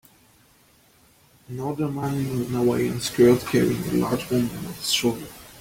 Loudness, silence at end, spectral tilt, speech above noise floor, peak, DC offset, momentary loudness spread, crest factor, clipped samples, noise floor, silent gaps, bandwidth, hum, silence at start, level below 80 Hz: -23 LUFS; 0 s; -5 dB/octave; 35 dB; -6 dBFS; under 0.1%; 13 LU; 18 dB; under 0.1%; -57 dBFS; none; 16.5 kHz; none; 1.5 s; -52 dBFS